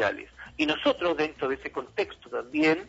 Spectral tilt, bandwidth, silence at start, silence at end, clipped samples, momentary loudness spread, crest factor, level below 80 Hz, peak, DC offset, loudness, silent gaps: -5 dB/octave; 8 kHz; 0 s; 0 s; under 0.1%; 10 LU; 18 dB; -58 dBFS; -10 dBFS; under 0.1%; -28 LUFS; none